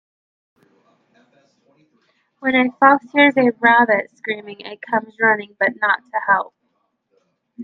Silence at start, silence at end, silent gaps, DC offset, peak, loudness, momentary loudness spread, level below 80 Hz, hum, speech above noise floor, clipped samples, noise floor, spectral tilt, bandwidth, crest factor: 2.4 s; 0 s; none; under 0.1%; 0 dBFS; -17 LUFS; 13 LU; -70 dBFS; none; 52 dB; under 0.1%; -69 dBFS; -6.5 dB/octave; 6 kHz; 20 dB